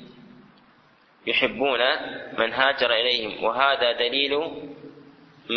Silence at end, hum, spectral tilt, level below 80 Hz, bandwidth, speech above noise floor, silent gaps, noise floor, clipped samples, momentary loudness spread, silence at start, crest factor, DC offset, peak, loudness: 0 s; none; -4.5 dB/octave; -62 dBFS; 6.4 kHz; 34 dB; none; -57 dBFS; under 0.1%; 13 LU; 0 s; 22 dB; under 0.1%; -4 dBFS; -22 LUFS